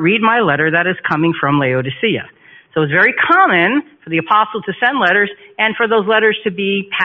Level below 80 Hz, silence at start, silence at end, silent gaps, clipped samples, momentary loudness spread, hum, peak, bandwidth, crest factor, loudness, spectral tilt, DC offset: -58 dBFS; 0 s; 0 s; none; under 0.1%; 8 LU; none; 0 dBFS; 5.8 kHz; 14 dB; -14 LUFS; -3 dB/octave; under 0.1%